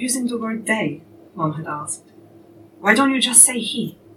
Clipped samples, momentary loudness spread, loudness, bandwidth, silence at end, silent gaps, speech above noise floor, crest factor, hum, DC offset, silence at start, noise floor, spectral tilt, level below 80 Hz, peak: under 0.1%; 17 LU; -17 LUFS; 18.5 kHz; 0.25 s; none; 27 dB; 20 dB; none; under 0.1%; 0 s; -46 dBFS; -2 dB/octave; -70 dBFS; 0 dBFS